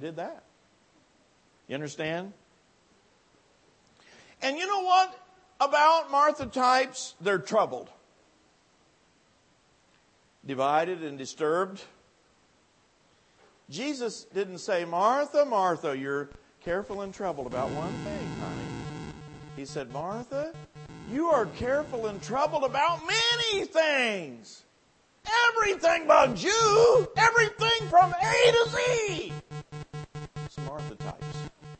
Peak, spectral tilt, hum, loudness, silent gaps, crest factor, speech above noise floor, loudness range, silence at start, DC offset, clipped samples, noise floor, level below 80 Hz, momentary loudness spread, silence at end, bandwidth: -8 dBFS; -3.5 dB/octave; none; -26 LUFS; none; 22 dB; 39 dB; 14 LU; 0 s; under 0.1%; under 0.1%; -65 dBFS; -58 dBFS; 19 LU; 0.05 s; 8.8 kHz